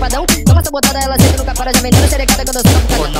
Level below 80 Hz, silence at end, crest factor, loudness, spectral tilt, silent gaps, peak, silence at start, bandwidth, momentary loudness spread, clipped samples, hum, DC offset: -18 dBFS; 0 s; 10 dB; -11 LUFS; -4.5 dB/octave; none; 0 dBFS; 0 s; 16.5 kHz; 3 LU; under 0.1%; none; 0.3%